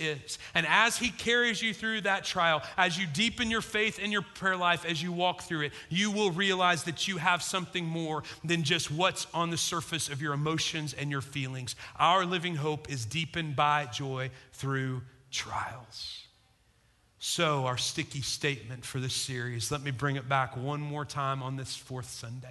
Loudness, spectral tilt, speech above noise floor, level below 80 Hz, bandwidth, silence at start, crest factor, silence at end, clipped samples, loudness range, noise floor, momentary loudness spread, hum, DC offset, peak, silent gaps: -30 LUFS; -3.5 dB/octave; 35 dB; -60 dBFS; 12.5 kHz; 0 s; 24 dB; 0 s; under 0.1%; 5 LU; -66 dBFS; 11 LU; none; under 0.1%; -8 dBFS; none